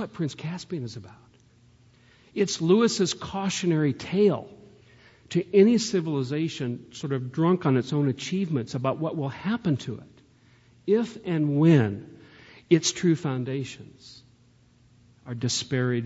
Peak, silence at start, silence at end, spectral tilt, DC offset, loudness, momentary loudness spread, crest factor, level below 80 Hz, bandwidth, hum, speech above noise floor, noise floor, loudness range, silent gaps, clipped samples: -6 dBFS; 0 s; 0 s; -5.5 dB/octave; under 0.1%; -25 LUFS; 15 LU; 20 dB; -64 dBFS; 8 kHz; none; 34 dB; -59 dBFS; 4 LU; none; under 0.1%